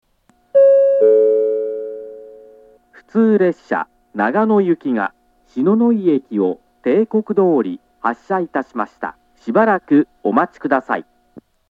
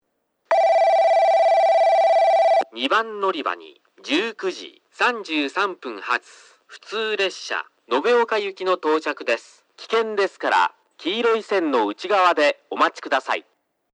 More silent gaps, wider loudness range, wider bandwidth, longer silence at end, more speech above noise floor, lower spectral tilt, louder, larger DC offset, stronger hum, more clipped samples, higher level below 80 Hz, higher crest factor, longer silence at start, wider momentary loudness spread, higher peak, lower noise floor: neither; second, 3 LU vs 7 LU; second, 6.8 kHz vs 10 kHz; second, 0.3 s vs 0.55 s; second, 42 dB vs 48 dB; first, -9 dB/octave vs -2.5 dB/octave; first, -17 LUFS vs -20 LUFS; neither; neither; neither; first, -64 dBFS vs -82 dBFS; about the same, 16 dB vs 16 dB; about the same, 0.55 s vs 0.5 s; about the same, 13 LU vs 11 LU; first, 0 dBFS vs -6 dBFS; second, -58 dBFS vs -70 dBFS